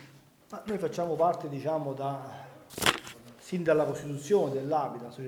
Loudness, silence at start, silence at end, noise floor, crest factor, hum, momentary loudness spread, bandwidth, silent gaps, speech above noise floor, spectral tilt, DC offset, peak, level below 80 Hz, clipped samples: -30 LUFS; 0 s; 0 s; -56 dBFS; 24 dB; none; 17 LU; over 20 kHz; none; 26 dB; -4.5 dB/octave; under 0.1%; -6 dBFS; -64 dBFS; under 0.1%